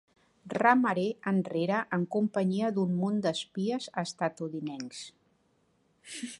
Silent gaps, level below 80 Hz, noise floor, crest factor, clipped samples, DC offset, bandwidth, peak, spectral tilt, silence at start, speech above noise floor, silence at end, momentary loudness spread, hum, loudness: none; -76 dBFS; -71 dBFS; 22 dB; under 0.1%; under 0.1%; 11.5 kHz; -8 dBFS; -6 dB/octave; 0.45 s; 41 dB; 0.05 s; 15 LU; none; -30 LUFS